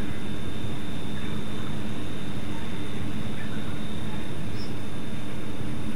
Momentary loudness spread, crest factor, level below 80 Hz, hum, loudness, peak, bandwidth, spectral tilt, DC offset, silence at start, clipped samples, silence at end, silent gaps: 2 LU; 12 dB; -46 dBFS; none; -34 LUFS; -14 dBFS; 16 kHz; -6 dB/octave; 10%; 0 s; under 0.1%; 0 s; none